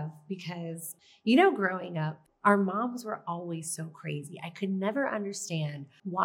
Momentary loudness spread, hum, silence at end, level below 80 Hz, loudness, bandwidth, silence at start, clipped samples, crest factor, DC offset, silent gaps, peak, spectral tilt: 14 LU; none; 0 s; -86 dBFS; -31 LUFS; 17.5 kHz; 0 s; under 0.1%; 22 dB; under 0.1%; none; -8 dBFS; -5.5 dB/octave